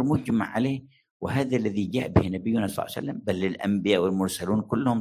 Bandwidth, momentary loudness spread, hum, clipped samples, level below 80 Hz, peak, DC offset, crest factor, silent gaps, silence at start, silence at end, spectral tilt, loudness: 16 kHz; 7 LU; none; under 0.1%; -46 dBFS; -6 dBFS; under 0.1%; 20 dB; 1.10-1.20 s; 0 s; 0 s; -6.5 dB/octave; -26 LUFS